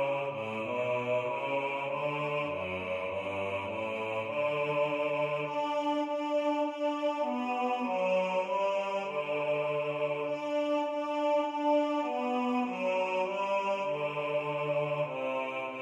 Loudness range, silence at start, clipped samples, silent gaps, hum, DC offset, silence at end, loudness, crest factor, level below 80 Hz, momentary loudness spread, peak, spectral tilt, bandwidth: 2 LU; 0 s; under 0.1%; none; none; under 0.1%; 0 s; -32 LUFS; 14 dB; -78 dBFS; 5 LU; -18 dBFS; -6 dB/octave; 8.8 kHz